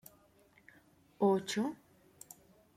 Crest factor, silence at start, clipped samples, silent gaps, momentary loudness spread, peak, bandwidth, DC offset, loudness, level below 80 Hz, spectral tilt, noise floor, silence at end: 20 dB; 1.2 s; under 0.1%; none; 25 LU; -18 dBFS; 16 kHz; under 0.1%; -34 LUFS; -78 dBFS; -5 dB/octave; -66 dBFS; 1 s